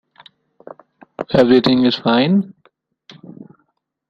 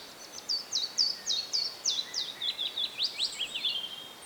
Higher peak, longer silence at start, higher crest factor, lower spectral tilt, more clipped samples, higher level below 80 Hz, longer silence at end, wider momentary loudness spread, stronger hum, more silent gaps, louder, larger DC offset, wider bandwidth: first, -2 dBFS vs -16 dBFS; first, 1.2 s vs 0 s; about the same, 18 dB vs 18 dB; first, -7.5 dB/octave vs 1.5 dB/octave; neither; first, -54 dBFS vs -76 dBFS; first, 0.65 s vs 0 s; first, 13 LU vs 7 LU; neither; neither; first, -14 LUFS vs -30 LUFS; neither; second, 7 kHz vs over 20 kHz